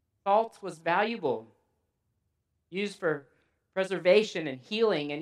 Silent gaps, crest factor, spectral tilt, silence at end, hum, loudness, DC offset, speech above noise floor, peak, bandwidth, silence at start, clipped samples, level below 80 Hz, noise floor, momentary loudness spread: none; 20 dB; -5 dB/octave; 0 s; none; -29 LUFS; under 0.1%; 50 dB; -10 dBFS; 11.5 kHz; 0.25 s; under 0.1%; -82 dBFS; -78 dBFS; 13 LU